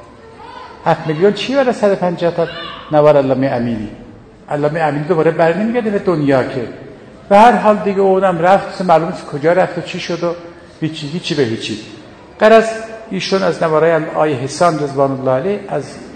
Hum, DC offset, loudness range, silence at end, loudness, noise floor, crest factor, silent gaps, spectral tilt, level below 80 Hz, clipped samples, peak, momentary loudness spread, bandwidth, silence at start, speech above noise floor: none; under 0.1%; 4 LU; 0 s; -14 LUFS; -36 dBFS; 14 dB; none; -6 dB/octave; -50 dBFS; 0.4%; 0 dBFS; 14 LU; 11 kHz; 0 s; 22 dB